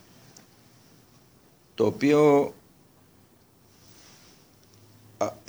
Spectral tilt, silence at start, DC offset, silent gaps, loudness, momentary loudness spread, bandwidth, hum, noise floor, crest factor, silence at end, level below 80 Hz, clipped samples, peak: -6.5 dB/octave; 1.8 s; under 0.1%; none; -23 LUFS; 14 LU; over 20 kHz; none; -59 dBFS; 22 dB; 0.15 s; -68 dBFS; under 0.1%; -8 dBFS